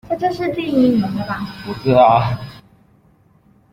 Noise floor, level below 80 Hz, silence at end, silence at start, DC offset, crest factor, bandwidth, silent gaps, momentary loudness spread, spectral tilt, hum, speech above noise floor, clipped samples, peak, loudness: -53 dBFS; -48 dBFS; 1.15 s; 0.1 s; under 0.1%; 16 dB; 15.5 kHz; none; 15 LU; -8 dB/octave; none; 37 dB; under 0.1%; -2 dBFS; -17 LUFS